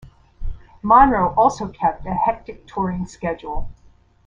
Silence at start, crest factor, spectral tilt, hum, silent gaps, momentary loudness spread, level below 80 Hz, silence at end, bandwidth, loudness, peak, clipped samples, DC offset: 0.05 s; 18 dB; -7 dB/octave; none; none; 22 LU; -34 dBFS; 0.55 s; 9.4 kHz; -19 LUFS; -2 dBFS; under 0.1%; under 0.1%